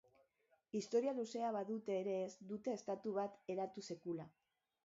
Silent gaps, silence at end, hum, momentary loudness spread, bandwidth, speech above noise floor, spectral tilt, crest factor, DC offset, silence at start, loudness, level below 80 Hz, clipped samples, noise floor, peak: none; 0.6 s; none; 9 LU; 7.6 kHz; 37 dB; -5.5 dB/octave; 18 dB; under 0.1%; 0.75 s; -44 LUFS; -88 dBFS; under 0.1%; -80 dBFS; -26 dBFS